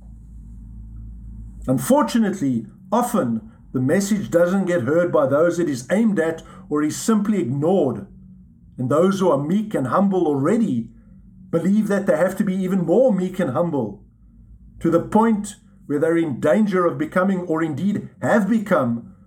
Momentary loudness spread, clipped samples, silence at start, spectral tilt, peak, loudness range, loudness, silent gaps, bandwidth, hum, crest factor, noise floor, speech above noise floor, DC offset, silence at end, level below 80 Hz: 11 LU; under 0.1%; 0 s; -7 dB/octave; -4 dBFS; 2 LU; -20 LUFS; none; 17 kHz; none; 16 dB; -47 dBFS; 28 dB; under 0.1%; 0.15 s; -46 dBFS